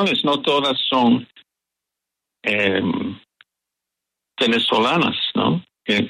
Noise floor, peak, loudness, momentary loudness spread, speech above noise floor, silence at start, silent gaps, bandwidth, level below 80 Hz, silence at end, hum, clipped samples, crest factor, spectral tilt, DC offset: -84 dBFS; -4 dBFS; -19 LUFS; 9 LU; 65 dB; 0 s; none; 11.5 kHz; -62 dBFS; 0 s; none; under 0.1%; 16 dB; -5.5 dB/octave; under 0.1%